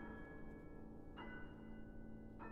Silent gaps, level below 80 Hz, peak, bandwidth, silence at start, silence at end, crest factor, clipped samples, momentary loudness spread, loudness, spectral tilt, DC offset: none; -60 dBFS; -40 dBFS; 5.6 kHz; 0 s; 0 s; 12 dB; under 0.1%; 3 LU; -56 LUFS; -5.5 dB/octave; under 0.1%